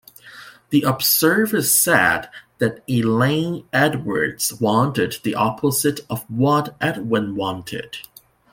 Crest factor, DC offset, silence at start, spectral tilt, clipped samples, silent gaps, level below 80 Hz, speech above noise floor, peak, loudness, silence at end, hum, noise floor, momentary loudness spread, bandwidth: 18 dB; under 0.1%; 0.25 s; -4 dB/octave; under 0.1%; none; -56 dBFS; 23 dB; -2 dBFS; -19 LUFS; 0.5 s; none; -43 dBFS; 13 LU; 17 kHz